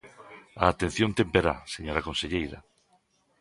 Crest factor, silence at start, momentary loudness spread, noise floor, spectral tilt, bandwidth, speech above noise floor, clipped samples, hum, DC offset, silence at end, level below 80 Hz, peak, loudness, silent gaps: 26 dB; 0.05 s; 23 LU; -68 dBFS; -5 dB/octave; 11.5 kHz; 41 dB; under 0.1%; none; under 0.1%; 0.8 s; -46 dBFS; -4 dBFS; -28 LUFS; none